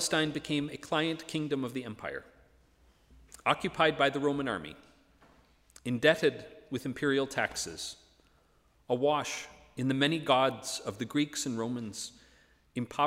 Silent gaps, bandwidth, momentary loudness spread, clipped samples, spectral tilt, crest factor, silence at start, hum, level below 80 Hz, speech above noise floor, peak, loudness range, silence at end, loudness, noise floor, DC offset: none; 16 kHz; 14 LU; under 0.1%; -4 dB/octave; 22 dB; 0 s; none; -64 dBFS; 36 dB; -10 dBFS; 3 LU; 0 s; -31 LUFS; -67 dBFS; under 0.1%